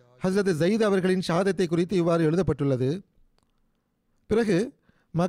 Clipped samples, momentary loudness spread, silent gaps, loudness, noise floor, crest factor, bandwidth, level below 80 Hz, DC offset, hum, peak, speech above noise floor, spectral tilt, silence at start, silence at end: under 0.1%; 5 LU; none; -25 LUFS; -71 dBFS; 12 dB; 14 kHz; -54 dBFS; under 0.1%; none; -14 dBFS; 48 dB; -7 dB/octave; 0.2 s; 0 s